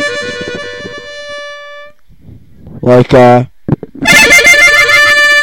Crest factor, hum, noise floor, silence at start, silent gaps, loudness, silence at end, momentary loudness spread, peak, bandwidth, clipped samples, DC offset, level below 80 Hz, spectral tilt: 8 dB; none; -37 dBFS; 0 s; none; -5 LUFS; 0 s; 22 LU; 0 dBFS; over 20 kHz; 1%; under 0.1%; -36 dBFS; -3.5 dB/octave